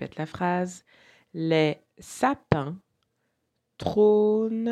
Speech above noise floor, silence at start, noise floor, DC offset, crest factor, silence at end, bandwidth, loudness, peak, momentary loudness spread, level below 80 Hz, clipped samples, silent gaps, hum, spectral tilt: 52 dB; 0 s; -77 dBFS; under 0.1%; 24 dB; 0 s; 13 kHz; -25 LUFS; -2 dBFS; 20 LU; -58 dBFS; under 0.1%; none; none; -6.5 dB/octave